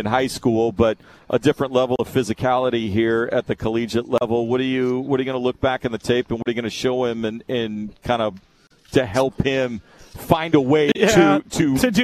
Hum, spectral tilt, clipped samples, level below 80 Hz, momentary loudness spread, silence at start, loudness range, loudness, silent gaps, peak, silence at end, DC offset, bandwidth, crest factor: none; -5.5 dB/octave; under 0.1%; -46 dBFS; 8 LU; 0 s; 4 LU; -20 LUFS; none; 0 dBFS; 0 s; under 0.1%; 14 kHz; 20 dB